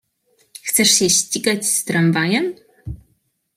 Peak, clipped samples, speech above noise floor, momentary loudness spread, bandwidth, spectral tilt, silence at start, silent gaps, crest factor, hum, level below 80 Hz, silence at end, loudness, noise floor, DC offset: -2 dBFS; under 0.1%; 48 dB; 22 LU; 16 kHz; -2.5 dB/octave; 0.65 s; none; 18 dB; none; -48 dBFS; 0.6 s; -16 LUFS; -65 dBFS; under 0.1%